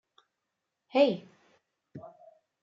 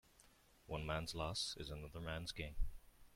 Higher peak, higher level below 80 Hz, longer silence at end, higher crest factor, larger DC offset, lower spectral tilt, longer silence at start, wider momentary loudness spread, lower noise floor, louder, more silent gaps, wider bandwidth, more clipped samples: first, -12 dBFS vs -28 dBFS; second, -84 dBFS vs -52 dBFS; first, 0.55 s vs 0.05 s; about the same, 22 dB vs 18 dB; neither; first, -6.5 dB/octave vs -4 dB/octave; first, 0.95 s vs 0.2 s; first, 26 LU vs 8 LU; first, -85 dBFS vs -69 dBFS; first, -28 LUFS vs -46 LUFS; neither; second, 7.2 kHz vs 16.5 kHz; neither